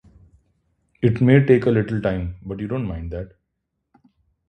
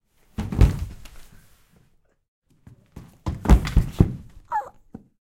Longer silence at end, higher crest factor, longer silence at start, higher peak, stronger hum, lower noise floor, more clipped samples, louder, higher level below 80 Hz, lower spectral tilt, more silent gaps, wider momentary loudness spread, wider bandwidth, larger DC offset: first, 1.25 s vs 0.55 s; about the same, 20 dB vs 22 dB; first, 1 s vs 0.4 s; about the same, -2 dBFS vs -2 dBFS; neither; first, -77 dBFS vs -61 dBFS; neither; first, -20 LUFS vs -23 LUFS; second, -42 dBFS vs -26 dBFS; first, -10 dB/octave vs -7.5 dB/octave; second, none vs 2.28-2.42 s; second, 16 LU vs 19 LU; second, 5.8 kHz vs 15.5 kHz; neither